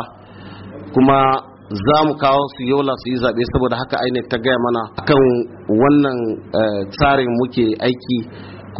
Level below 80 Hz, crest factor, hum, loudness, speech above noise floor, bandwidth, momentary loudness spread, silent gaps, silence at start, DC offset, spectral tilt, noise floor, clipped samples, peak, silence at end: -40 dBFS; 14 dB; none; -17 LUFS; 21 dB; 5.8 kHz; 9 LU; none; 0 s; under 0.1%; -5 dB/octave; -37 dBFS; under 0.1%; -2 dBFS; 0 s